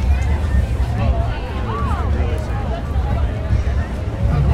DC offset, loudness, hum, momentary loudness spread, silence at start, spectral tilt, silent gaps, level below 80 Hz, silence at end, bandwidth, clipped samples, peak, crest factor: under 0.1%; -20 LUFS; none; 4 LU; 0 s; -8 dB/octave; none; -20 dBFS; 0 s; 9.2 kHz; under 0.1%; -4 dBFS; 14 dB